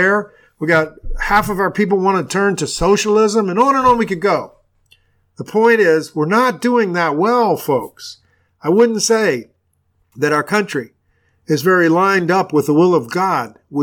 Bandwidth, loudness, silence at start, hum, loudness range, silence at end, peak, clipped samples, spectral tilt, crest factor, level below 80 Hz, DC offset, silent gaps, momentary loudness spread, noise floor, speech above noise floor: 19 kHz; -15 LUFS; 0 s; none; 3 LU; 0 s; -2 dBFS; under 0.1%; -5 dB/octave; 14 dB; -38 dBFS; under 0.1%; none; 12 LU; -63 dBFS; 48 dB